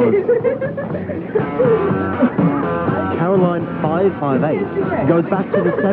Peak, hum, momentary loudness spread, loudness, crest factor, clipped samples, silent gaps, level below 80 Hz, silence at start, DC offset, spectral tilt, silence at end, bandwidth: -2 dBFS; none; 6 LU; -17 LUFS; 16 dB; under 0.1%; none; -48 dBFS; 0 s; under 0.1%; -11.5 dB/octave; 0 s; 4.4 kHz